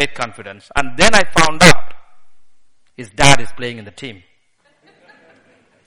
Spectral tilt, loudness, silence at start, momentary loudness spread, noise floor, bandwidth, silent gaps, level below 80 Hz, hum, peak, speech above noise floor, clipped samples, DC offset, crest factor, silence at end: -3 dB/octave; -13 LUFS; 0 s; 24 LU; -59 dBFS; over 20 kHz; none; -36 dBFS; none; 0 dBFS; 47 dB; 0.3%; under 0.1%; 16 dB; 0 s